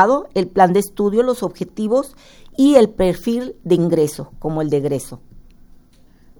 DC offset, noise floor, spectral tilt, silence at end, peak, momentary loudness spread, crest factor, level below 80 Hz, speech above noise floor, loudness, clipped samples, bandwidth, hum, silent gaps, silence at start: under 0.1%; -48 dBFS; -6.5 dB/octave; 1 s; 0 dBFS; 12 LU; 18 dB; -42 dBFS; 31 dB; -17 LUFS; under 0.1%; over 20 kHz; none; none; 0 s